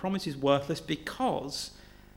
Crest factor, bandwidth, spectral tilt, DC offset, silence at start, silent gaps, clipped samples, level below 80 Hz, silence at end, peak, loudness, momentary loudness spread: 20 dB; 17 kHz; -5 dB/octave; under 0.1%; 0 s; none; under 0.1%; -56 dBFS; 0.25 s; -12 dBFS; -31 LUFS; 9 LU